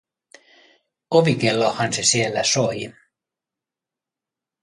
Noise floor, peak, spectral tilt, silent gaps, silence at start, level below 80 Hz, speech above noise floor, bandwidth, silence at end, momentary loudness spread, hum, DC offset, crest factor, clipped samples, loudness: -88 dBFS; -4 dBFS; -3.5 dB/octave; none; 1.1 s; -62 dBFS; 68 dB; 11.5 kHz; 1.7 s; 7 LU; none; under 0.1%; 20 dB; under 0.1%; -19 LUFS